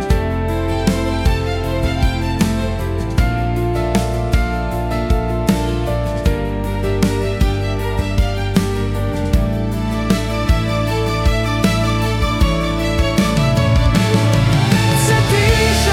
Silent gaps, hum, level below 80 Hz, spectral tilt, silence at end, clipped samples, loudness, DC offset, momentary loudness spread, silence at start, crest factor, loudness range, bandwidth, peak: none; none; -22 dBFS; -5.5 dB/octave; 0 s; under 0.1%; -17 LUFS; under 0.1%; 6 LU; 0 s; 14 dB; 4 LU; 16.5 kHz; -2 dBFS